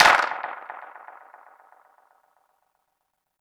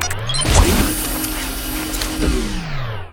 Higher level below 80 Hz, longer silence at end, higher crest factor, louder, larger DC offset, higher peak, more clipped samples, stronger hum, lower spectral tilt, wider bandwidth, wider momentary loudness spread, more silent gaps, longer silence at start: second, -62 dBFS vs -22 dBFS; first, 2.5 s vs 0 s; first, 24 dB vs 18 dB; second, -22 LUFS vs -19 LUFS; neither; second, -4 dBFS vs 0 dBFS; neither; neither; second, -0.5 dB/octave vs -3.5 dB/octave; about the same, 19.5 kHz vs 19 kHz; first, 27 LU vs 11 LU; neither; about the same, 0 s vs 0 s